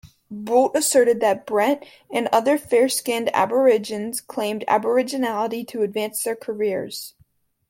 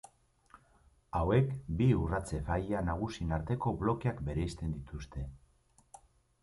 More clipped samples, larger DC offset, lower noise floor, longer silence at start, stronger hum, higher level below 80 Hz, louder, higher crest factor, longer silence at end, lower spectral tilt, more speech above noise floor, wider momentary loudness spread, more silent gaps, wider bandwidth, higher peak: neither; neither; second, -61 dBFS vs -68 dBFS; second, 0.05 s vs 1.15 s; neither; second, -66 dBFS vs -46 dBFS; first, -21 LUFS vs -34 LUFS; about the same, 16 dB vs 20 dB; second, 0.6 s vs 1.05 s; second, -3 dB/octave vs -8 dB/octave; first, 40 dB vs 35 dB; about the same, 11 LU vs 13 LU; neither; first, 16.5 kHz vs 11.5 kHz; first, -4 dBFS vs -16 dBFS